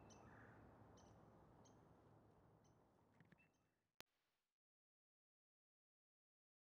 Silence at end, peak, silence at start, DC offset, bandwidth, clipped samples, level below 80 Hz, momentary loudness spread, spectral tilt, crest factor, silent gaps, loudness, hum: 2.3 s; -34 dBFS; 0 s; under 0.1%; 6.4 kHz; under 0.1%; -84 dBFS; 3 LU; -4.5 dB/octave; 36 dB; 3.96-4.07 s; -68 LUFS; none